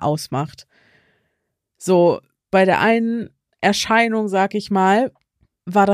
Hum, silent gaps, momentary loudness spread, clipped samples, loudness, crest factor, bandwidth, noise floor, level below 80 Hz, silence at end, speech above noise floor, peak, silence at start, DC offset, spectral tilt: none; none; 12 LU; under 0.1%; -18 LUFS; 16 dB; 15.5 kHz; -75 dBFS; -58 dBFS; 0 s; 58 dB; -4 dBFS; 0 s; under 0.1%; -5 dB/octave